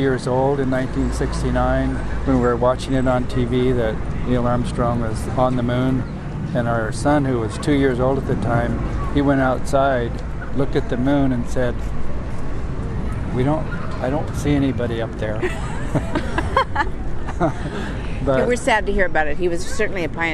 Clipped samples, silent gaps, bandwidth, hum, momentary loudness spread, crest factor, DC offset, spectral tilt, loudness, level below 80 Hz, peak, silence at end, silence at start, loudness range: under 0.1%; none; 12 kHz; none; 9 LU; 16 dB; under 0.1%; -7 dB/octave; -21 LUFS; -28 dBFS; -2 dBFS; 0 s; 0 s; 3 LU